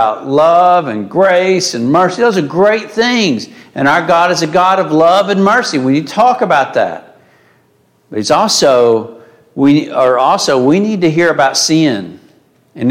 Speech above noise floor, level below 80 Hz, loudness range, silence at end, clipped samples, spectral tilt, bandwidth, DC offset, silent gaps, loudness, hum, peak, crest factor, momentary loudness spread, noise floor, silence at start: 42 dB; -56 dBFS; 3 LU; 0 s; under 0.1%; -4.5 dB/octave; 16 kHz; under 0.1%; none; -11 LUFS; none; 0 dBFS; 10 dB; 8 LU; -53 dBFS; 0 s